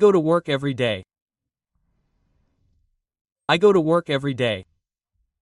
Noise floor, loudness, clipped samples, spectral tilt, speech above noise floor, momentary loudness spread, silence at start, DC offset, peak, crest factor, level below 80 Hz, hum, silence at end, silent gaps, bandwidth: -79 dBFS; -21 LUFS; under 0.1%; -6.5 dB/octave; 60 dB; 12 LU; 0 s; under 0.1%; -2 dBFS; 20 dB; -62 dBFS; none; 0.8 s; 1.22-1.26 s, 3.21-3.25 s, 3.32-3.36 s; 11 kHz